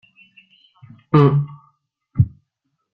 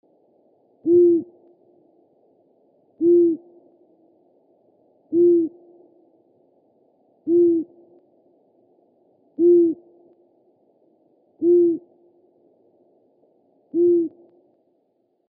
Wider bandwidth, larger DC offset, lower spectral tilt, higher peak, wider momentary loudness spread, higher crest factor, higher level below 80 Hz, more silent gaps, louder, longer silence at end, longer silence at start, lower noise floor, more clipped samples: first, 5 kHz vs 0.8 kHz; neither; second, -10.5 dB/octave vs -16.5 dB/octave; first, -2 dBFS vs -8 dBFS; about the same, 16 LU vs 15 LU; about the same, 20 dB vs 16 dB; first, -48 dBFS vs -88 dBFS; neither; about the same, -18 LUFS vs -19 LUFS; second, 0.65 s vs 1.2 s; first, 1.15 s vs 0.85 s; first, -74 dBFS vs -68 dBFS; neither